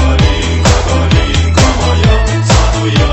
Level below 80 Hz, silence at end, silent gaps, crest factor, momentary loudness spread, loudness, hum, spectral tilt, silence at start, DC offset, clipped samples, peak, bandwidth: -12 dBFS; 0 s; none; 8 dB; 1 LU; -10 LUFS; none; -5 dB/octave; 0 s; under 0.1%; 0.3%; 0 dBFS; 8.6 kHz